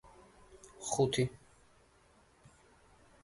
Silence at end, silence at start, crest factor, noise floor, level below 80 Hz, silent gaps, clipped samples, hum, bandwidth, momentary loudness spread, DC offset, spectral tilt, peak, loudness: 1.85 s; 0.5 s; 22 dB; -66 dBFS; -64 dBFS; none; under 0.1%; none; 11.5 kHz; 26 LU; under 0.1%; -4.5 dB/octave; -18 dBFS; -34 LUFS